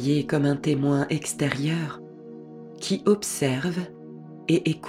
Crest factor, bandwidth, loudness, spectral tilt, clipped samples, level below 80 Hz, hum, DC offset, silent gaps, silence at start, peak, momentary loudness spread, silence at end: 20 dB; 15.5 kHz; -25 LUFS; -5.5 dB/octave; under 0.1%; -60 dBFS; none; under 0.1%; none; 0 s; -6 dBFS; 19 LU; 0 s